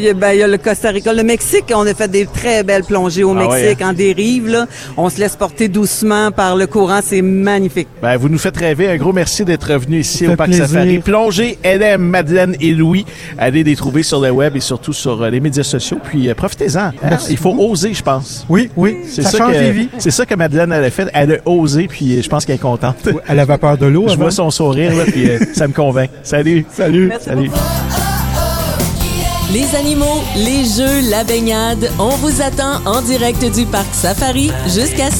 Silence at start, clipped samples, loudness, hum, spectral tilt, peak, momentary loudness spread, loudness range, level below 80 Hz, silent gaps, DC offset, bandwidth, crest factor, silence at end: 0 s; under 0.1%; -13 LUFS; none; -5 dB/octave; 0 dBFS; 5 LU; 3 LU; -30 dBFS; none; under 0.1%; 18 kHz; 12 dB; 0 s